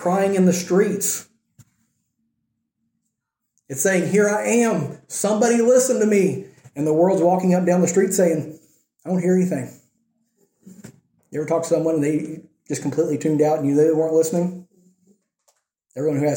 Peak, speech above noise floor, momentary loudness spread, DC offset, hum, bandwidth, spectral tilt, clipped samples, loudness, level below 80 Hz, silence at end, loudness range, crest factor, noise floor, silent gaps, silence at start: -6 dBFS; 60 dB; 13 LU; under 0.1%; none; 17 kHz; -5.5 dB/octave; under 0.1%; -19 LUFS; -68 dBFS; 0 s; 7 LU; 16 dB; -79 dBFS; none; 0 s